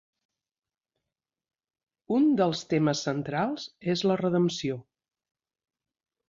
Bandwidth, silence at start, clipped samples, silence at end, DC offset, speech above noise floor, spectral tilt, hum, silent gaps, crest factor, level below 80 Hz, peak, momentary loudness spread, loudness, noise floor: 7.6 kHz; 2.1 s; under 0.1%; 1.5 s; under 0.1%; 62 dB; -6 dB/octave; none; none; 18 dB; -70 dBFS; -12 dBFS; 9 LU; -27 LUFS; -88 dBFS